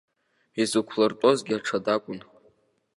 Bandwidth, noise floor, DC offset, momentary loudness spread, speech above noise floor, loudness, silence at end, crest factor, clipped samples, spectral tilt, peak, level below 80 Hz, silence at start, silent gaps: 11.5 kHz; -64 dBFS; under 0.1%; 16 LU; 40 dB; -25 LUFS; 0.8 s; 20 dB; under 0.1%; -4 dB/octave; -6 dBFS; -72 dBFS; 0.55 s; none